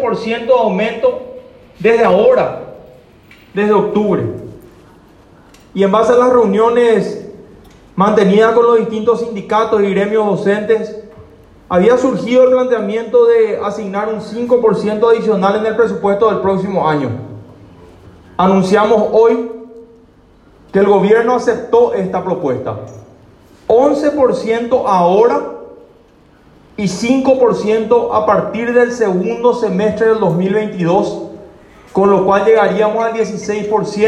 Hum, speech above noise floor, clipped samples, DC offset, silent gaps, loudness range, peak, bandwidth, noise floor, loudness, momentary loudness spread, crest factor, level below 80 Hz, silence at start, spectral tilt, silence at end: none; 34 dB; under 0.1%; under 0.1%; none; 2 LU; 0 dBFS; 10.5 kHz; -46 dBFS; -13 LUFS; 13 LU; 12 dB; -50 dBFS; 0 s; -6.5 dB/octave; 0 s